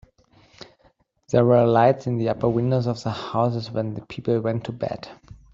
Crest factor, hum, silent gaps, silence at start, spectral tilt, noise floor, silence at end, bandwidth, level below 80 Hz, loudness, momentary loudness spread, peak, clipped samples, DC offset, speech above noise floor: 18 dB; none; none; 1.3 s; -8 dB/octave; -61 dBFS; 0.2 s; 7.6 kHz; -56 dBFS; -22 LUFS; 13 LU; -4 dBFS; under 0.1%; under 0.1%; 40 dB